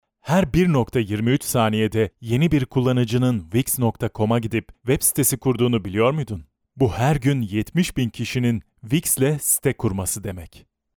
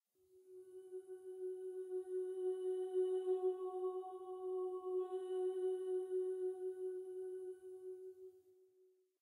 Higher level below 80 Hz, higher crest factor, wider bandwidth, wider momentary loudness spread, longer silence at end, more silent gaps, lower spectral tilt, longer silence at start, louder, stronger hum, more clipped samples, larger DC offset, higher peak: first, -44 dBFS vs under -90 dBFS; about the same, 16 dB vs 14 dB; first, over 20 kHz vs 11 kHz; second, 6 LU vs 14 LU; second, 0.5 s vs 0.7 s; neither; about the same, -5.5 dB/octave vs -5 dB/octave; about the same, 0.25 s vs 0.35 s; first, -21 LUFS vs -43 LUFS; neither; neither; neither; first, -4 dBFS vs -30 dBFS